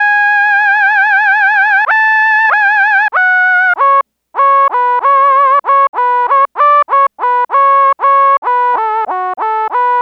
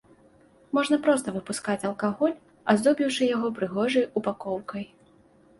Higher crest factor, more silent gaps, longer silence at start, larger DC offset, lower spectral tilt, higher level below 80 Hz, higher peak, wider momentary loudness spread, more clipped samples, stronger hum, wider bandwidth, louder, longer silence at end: second, 8 dB vs 20 dB; first, 5.89-5.93 s, 8.38-8.42 s vs none; second, 0 s vs 0.75 s; neither; second, -1 dB/octave vs -5 dB/octave; second, -74 dBFS vs -66 dBFS; first, -2 dBFS vs -8 dBFS; second, 5 LU vs 10 LU; neither; first, 60 Hz at -75 dBFS vs none; second, 6.4 kHz vs 11.5 kHz; first, -9 LUFS vs -26 LUFS; second, 0 s vs 0.75 s